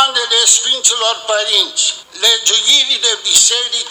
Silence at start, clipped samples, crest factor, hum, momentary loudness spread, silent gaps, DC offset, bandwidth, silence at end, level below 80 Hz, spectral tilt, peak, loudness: 0 s; under 0.1%; 14 dB; none; 6 LU; none; under 0.1%; over 20 kHz; 0 s; -64 dBFS; 3.5 dB/octave; 0 dBFS; -10 LUFS